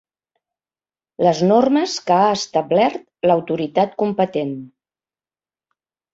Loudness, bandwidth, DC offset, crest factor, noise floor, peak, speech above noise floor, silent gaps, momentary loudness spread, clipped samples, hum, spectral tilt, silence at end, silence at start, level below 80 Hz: -18 LUFS; 8 kHz; under 0.1%; 18 dB; under -90 dBFS; -2 dBFS; over 73 dB; none; 7 LU; under 0.1%; none; -5.5 dB/octave; 1.45 s; 1.2 s; -62 dBFS